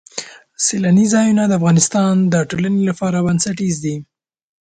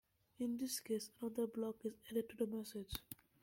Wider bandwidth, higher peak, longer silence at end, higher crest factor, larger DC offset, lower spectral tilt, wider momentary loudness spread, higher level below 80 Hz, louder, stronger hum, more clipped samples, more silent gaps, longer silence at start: second, 9.4 kHz vs 16.5 kHz; first, 0 dBFS vs -24 dBFS; first, 0.65 s vs 0.3 s; second, 16 dB vs 22 dB; neither; about the same, -5 dB/octave vs -4.5 dB/octave; first, 12 LU vs 7 LU; first, -52 dBFS vs -66 dBFS; first, -15 LUFS vs -44 LUFS; neither; neither; neither; second, 0.15 s vs 0.4 s